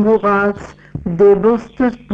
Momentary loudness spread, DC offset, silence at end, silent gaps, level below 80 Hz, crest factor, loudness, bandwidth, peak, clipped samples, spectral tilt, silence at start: 17 LU; under 0.1%; 0 s; none; -40 dBFS; 12 dB; -14 LUFS; 7.6 kHz; -2 dBFS; under 0.1%; -8.5 dB/octave; 0 s